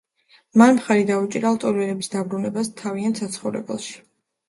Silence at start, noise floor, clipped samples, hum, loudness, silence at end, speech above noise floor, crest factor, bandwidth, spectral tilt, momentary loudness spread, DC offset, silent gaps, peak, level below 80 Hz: 0.55 s; -58 dBFS; under 0.1%; none; -21 LUFS; 0.5 s; 38 dB; 20 dB; 11.5 kHz; -5.5 dB/octave; 14 LU; under 0.1%; none; -2 dBFS; -66 dBFS